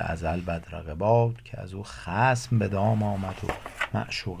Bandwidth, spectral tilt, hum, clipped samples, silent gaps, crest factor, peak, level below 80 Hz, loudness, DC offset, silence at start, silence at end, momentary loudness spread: 14.5 kHz; -6.5 dB/octave; none; under 0.1%; none; 18 dB; -10 dBFS; -44 dBFS; -27 LUFS; under 0.1%; 0 s; 0 s; 15 LU